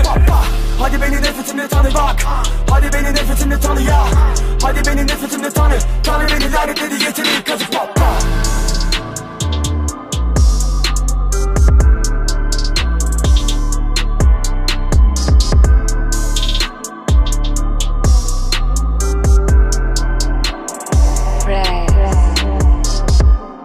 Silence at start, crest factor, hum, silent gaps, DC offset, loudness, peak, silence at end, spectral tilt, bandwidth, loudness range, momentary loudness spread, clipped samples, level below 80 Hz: 0 s; 12 dB; none; none; under 0.1%; -15 LUFS; 0 dBFS; 0 s; -4.5 dB/octave; 15.5 kHz; 2 LU; 6 LU; under 0.1%; -14 dBFS